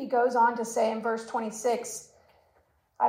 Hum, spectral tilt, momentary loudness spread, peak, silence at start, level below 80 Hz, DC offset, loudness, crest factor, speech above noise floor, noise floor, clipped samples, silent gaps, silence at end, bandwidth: none; -3.5 dB/octave; 10 LU; -12 dBFS; 0 s; -76 dBFS; under 0.1%; -28 LUFS; 16 dB; 40 dB; -68 dBFS; under 0.1%; none; 0 s; 16 kHz